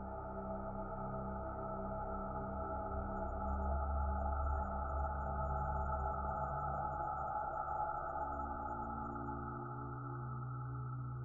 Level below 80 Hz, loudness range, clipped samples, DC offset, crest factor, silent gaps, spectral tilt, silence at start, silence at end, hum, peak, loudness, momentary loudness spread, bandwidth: -46 dBFS; 3 LU; under 0.1%; under 0.1%; 14 dB; none; -11 dB/octave; 0 s; 0 s; none; -26 dBFS; -42 LUFS; 5 LU; 2.2 kHz